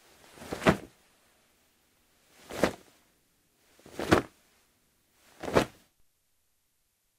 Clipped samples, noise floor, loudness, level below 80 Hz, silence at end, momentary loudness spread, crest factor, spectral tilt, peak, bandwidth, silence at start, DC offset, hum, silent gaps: under 0.1%; -75 dBFS; -30 LUFS; -56 dBFS; 1.5 s; 21 LU; 30 dB; -5 dB/octave; -4 dBFS; 16 kHz; 0.4 s; under 0.1%; none; none